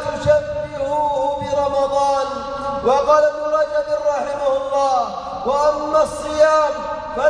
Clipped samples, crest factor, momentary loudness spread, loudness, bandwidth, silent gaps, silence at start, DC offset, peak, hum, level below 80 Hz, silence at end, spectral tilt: under 0.1%; 14 dB; 10 LU; -18 LUFS; 10.5 kHz; none; 0 s; under 0.1%; -4 dBFS; none; -44 dBFS; 0 s; -4.5 dB/octave